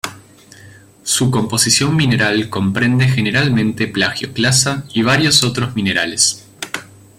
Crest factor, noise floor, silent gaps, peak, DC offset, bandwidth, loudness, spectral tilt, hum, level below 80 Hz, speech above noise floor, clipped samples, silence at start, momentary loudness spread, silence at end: 16 dB; -42 dBFS; none; 0 dBFS; under 0.1%; 16.5 kHz; -14 LUFS; -3.5 dB/octave; none; -48 dBFS; 27 dB; under 0.1%; 0.05 s; 14 LU; 0.35 s